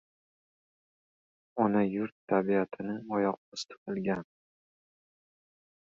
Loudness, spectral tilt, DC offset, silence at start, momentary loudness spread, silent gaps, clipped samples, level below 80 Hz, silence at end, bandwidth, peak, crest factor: -32 LUFS; -6.5 dB/octave; under 0.1%; 1.55 s; 12 LU; 2.12-2.27 s, 3.37-3.52 s, 3.78-3.86 s; under 0.1%; -72 dBFS; 1.7 s; 7.6 kHz; -12 dBFS; 22 dB